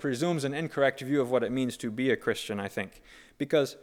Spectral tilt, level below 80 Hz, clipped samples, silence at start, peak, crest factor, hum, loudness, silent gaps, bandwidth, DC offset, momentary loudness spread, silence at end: -5.5 dB/octave; -64 dBFS; under 0.1%; 0 s; -12 dBFS; 18 dB; none; -29 LUFS; none; 17 kHz; under 0.1%; 8 LU; 0.05 s